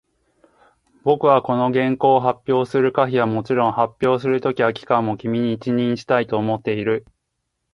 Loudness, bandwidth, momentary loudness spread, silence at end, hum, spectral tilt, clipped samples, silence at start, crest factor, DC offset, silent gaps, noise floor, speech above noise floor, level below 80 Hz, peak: -19 LUFS; 10.5 kHz; 6 LU; 0.75 s; none; -8 dB/octave; under 0.1%; 1.05 s; 18 dB; under 0.1%; none; -75 dBFS; 57 dB; -60 dBFS; -2 dBFS